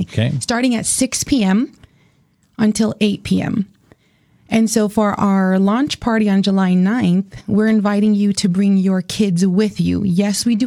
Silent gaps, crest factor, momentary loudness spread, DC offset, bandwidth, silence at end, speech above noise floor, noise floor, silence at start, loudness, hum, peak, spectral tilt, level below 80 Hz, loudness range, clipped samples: none; 16 dB; 4 LU; under 0.1%; 13.5 kHz; 0 s; 42 dB; -57 dBFS; 0 s; -16 LUFS; none; 0 dBFS; -5.5 dB/octave; -46 dBFS; 4 LU; under 0.1%